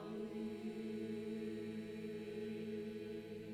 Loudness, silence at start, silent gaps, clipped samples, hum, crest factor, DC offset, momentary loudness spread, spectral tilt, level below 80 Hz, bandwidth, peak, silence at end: -46 LUFS; 0 s; none; under 0.1%; none; 10 dB; under 0.1%; 3 LU; -7 dB/octave; -74 dBFS; 14 kHz; -34 dBFS; 0 s